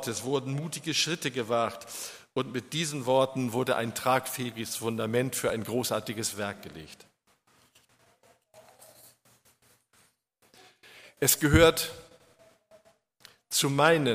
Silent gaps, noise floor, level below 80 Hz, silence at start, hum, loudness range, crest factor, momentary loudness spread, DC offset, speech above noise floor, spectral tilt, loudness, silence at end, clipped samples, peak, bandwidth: none; -68 dBFS; -50 dBFS; 0 s; none; 9 LU; 24 dB; 14 LU; under 0.1%; 40 dB; -4 dB/octave; -28 LUFS; 0 s; under 0.1%; -6 dBFS; 15.5 kHz